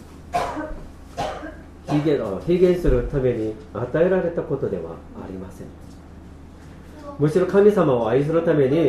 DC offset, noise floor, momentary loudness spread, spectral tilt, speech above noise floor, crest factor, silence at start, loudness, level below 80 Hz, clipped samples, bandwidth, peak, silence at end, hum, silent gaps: under 0.1%; -41 dBFS; 21 LU; -8 dB/octave; 21 dB; 18 dB; 0 s; -21 LUFS; -36 dBFS; under 0.1%; 13 kHz; -4 dBFS; 0 s; none; none